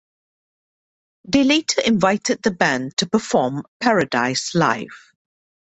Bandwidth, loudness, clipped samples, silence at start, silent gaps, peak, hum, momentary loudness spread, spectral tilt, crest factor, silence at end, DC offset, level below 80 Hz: 8.4 kHz; -19 LUFS; under 0.1%; 1.25 s; 3.68-3.80 s; -2 dBFS; none; 5 LU; -4 dB/octave; 18 dB; 0.8 s; under 0.1%; -56 dBFS